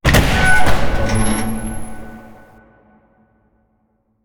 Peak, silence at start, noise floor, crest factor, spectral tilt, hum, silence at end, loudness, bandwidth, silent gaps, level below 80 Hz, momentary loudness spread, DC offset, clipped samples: 0 dBFS; 0.05 s; -63 dBFS; 14 dB; -4.5 dB/octave; none; 2.05 s; -17 LUFS; 19.5 kHz; none; -24 dBFS; 22 LU; under 0.1%; under 0.1%